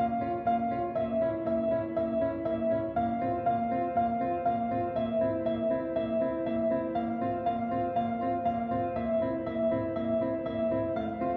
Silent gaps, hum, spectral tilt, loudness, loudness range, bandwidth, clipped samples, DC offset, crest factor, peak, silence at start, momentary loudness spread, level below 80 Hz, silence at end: none; none; -7 dB/octave; -30 LUFS; 1 LU; 4.5 kHz; under 0.1%; under 0.1%; 12 dB; -18 dBFS; 0 s; 2 LU; -54 dBFS; 0 s